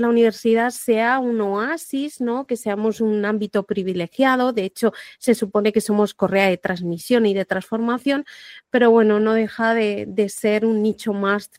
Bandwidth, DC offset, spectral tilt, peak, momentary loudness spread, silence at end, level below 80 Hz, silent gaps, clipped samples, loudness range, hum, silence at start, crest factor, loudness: 16 kHz; under 0.1%; -5.5 dB/octave; -2 dBFS; 7 LU; 0.1 s; -64 dBFS; none; under 0.1%; 3 LU; none; 0 s; 18 dB; -20 LUFS